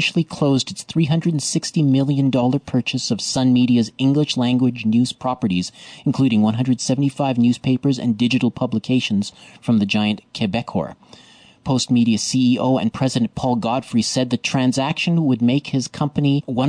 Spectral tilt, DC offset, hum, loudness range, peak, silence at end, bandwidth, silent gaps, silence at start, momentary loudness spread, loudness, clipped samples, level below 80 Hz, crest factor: -5.5 dB/octave; under 0.1%; none; 2 LU; -8 dBFS; 0 s; 10 kHz; none; 0 s; 6 LU; -19 LUFS; under 0.1%; -54 dBFS; 12 dB